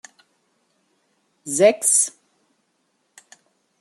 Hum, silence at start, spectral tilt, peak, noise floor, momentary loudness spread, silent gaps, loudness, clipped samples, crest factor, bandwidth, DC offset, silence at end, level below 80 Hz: none; 1.45 s; -2 dB/octave; -2 dBFS; -69 dBFS; 13 LU; none; -17 LUFS; under 0.1%; 22 dB; 13 kHz; under 0.1%; 1.7 s; -78 dBFS